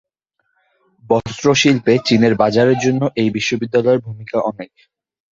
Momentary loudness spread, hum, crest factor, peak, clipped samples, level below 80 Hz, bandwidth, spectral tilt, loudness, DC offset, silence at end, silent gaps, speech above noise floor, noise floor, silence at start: 8 LU; none; 16 dB; -2 dBFS; under 0.1%; -52 dBFS; 7.8 kHz; -5 dB/octave; -16 LUFS; under 0.1%; 0.65 s; none; 54 dB; -70 dBFS; 1.1 s